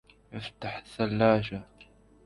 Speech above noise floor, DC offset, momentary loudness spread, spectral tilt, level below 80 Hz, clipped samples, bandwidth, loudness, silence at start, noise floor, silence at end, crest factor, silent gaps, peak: 28 dB; under 0.1%; 17 LU; -7.5 dB/octave; -56 dBFS; under 0.1%; 11.5 kHz; -29 LUFS; 0.3 s; -57 dBFS; 0.4 s; 20 dB; none; -10 dBFS